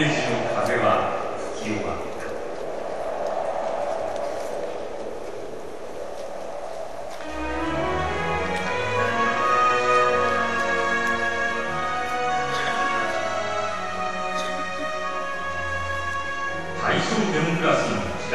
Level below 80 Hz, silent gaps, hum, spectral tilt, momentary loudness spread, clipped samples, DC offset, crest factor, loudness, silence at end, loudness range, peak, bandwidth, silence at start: -48 dBFS; none; none; -4.5 dB/octave; 13 LU; under 0.1%; 2%; 18 dB; -25 LUFS; 0 s; 9 LU; -8 dBFS; 13 kHz; 0 s